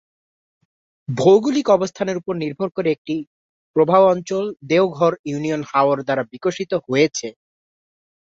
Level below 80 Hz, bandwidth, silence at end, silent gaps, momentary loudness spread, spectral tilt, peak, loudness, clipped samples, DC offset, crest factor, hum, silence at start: -64 dBFS; 7.8 kHz; 0.95 s; 2.98-3.05 s, 3.27-3.74 s, 5.19-5.24 s; 11 LU; -5.5 dB/octave; -2 dBFS; -19 LUFS; under 0.1%; under 0.1%; 18 dB; none; 1.1 s